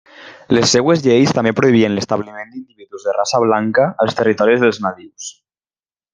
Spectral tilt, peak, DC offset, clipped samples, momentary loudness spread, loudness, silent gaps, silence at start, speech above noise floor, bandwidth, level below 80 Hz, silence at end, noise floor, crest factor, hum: -5 dB/octave; 0 dBFS; under 0.1%; under 0.1%; 18 LU; -15 LUFS; none; 0.2 s; over 75 dB; 10 kHz; -56 dBFS; 0.85 s; under -90 dBFS; 16 dB; none